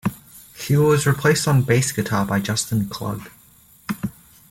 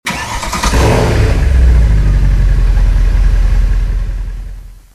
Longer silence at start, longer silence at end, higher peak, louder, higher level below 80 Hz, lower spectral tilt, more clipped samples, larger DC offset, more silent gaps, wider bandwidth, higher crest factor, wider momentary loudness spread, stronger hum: about the same, 0.05 s vs 0.05 s; first, 0.4 s vs 0.2 s; second, -4 dBFS vs 0 dBFS; second, -20 LUFS vs -13 LUFS; second, -50 dBFS vs -10 dBFS; about the same, -5 dB/octave vs -5.5 dB/octave; neither; neither; neither; first, 17 kHz vs 13 kHz; first, 16 dB vs 10 dB; first, 16 LU vs 11 LU; neither